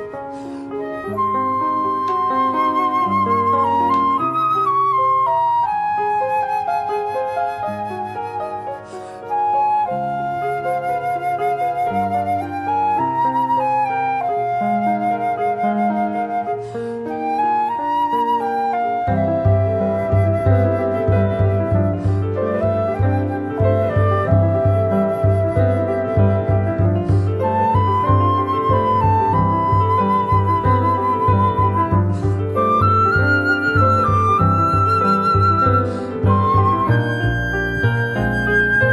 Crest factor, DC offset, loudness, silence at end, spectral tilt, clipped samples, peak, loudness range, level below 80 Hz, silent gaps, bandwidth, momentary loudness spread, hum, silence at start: 14 dB; under 0.1%; -18 LUFS; 0 s; -8.5 dB/octave; under 0.1%; -4 dBFS; 5 LU; -38 dBFS; none; 11.5 kHz; 7 LU; none; 0 s